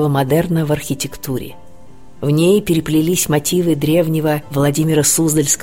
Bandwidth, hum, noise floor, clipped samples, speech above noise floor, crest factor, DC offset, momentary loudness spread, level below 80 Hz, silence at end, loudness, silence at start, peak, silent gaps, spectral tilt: 16.5 kHz; none; -43 dBFS; under 0.1%; 28 dB; 14 dB; 1%; 10 LU; -42 dBFS; 0 s; -16 LUFS; 0 s; -2 dBFS; none; -5 dB/octave